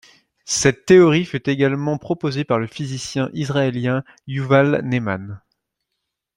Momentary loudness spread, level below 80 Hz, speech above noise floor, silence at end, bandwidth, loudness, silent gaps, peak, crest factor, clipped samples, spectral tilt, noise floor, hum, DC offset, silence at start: 14 LU; -54 dBFS; 60 dB; 1 s; 12 kHz; -19 LUFS; none; -2 dBFS; 18 dB; under 0.1%; -5.5 dB/octave; -78 dBFS; none; under 0.1%; 0.45 s